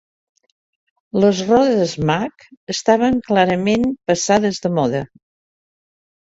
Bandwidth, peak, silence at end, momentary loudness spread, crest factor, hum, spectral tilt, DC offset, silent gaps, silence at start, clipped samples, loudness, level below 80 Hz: 8 kHz; -2 dBFS; 1.35 s; 10 LU; 18 dB; none; -5 dB/octave; under 0.1%; 2.57-2.67 s; 1.15 s; under 0.1%; -17 LUFS; -50 dBFS